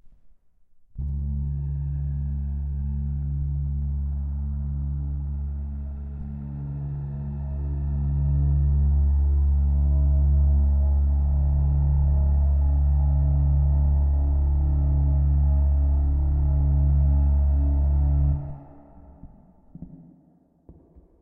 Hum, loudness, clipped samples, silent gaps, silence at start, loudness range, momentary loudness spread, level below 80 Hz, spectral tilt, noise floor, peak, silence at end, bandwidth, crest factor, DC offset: none; -24 LUFS; under 0.1%; none; 0.05 s; 9 LU; 10 LU; -24 dBFS; -14 dB/octave; -59 dBFS; -12 dBFS; 1.2 s; 1.4 kHz; 10 dB; under 0.1%